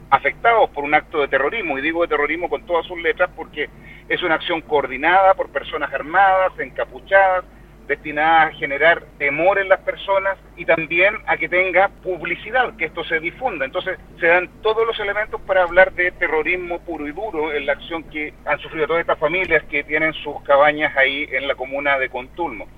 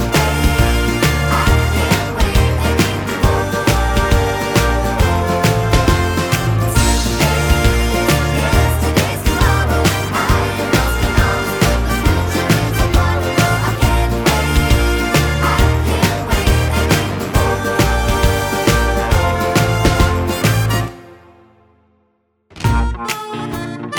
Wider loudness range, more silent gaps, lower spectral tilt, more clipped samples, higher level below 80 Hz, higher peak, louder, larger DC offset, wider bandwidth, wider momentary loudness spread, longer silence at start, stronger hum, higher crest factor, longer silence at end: about the same, 4 LU vs 2 LU; neither; about the same, -6 dB/octave vs -5 dB/octave; neither; second, -44 dBFS vs -20 dBFS; about the same, 0 dBFS vs 0 dBFS; second, -19 LUFS vs -15 LUFS; neither; second, 4.9 kHz vs over 20 kHz; first, 11 LU vs 3 LU; about the same, 0 s vs 0 s; neither; first, 20 dB vs 14 dB; about the same, 0.1 s vs 0 s